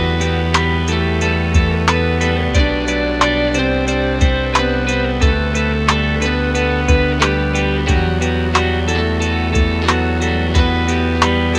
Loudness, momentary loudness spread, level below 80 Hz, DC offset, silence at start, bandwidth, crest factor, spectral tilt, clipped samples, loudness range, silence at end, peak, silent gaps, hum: -16 LUFS; 2 LU; -22 dBFS; under 0.1%; 0 s; 10 kHz; 14 dB; -5.5 dB/octave; under 0.1%; 0 LU; 0 s; -2 dBFS; none; none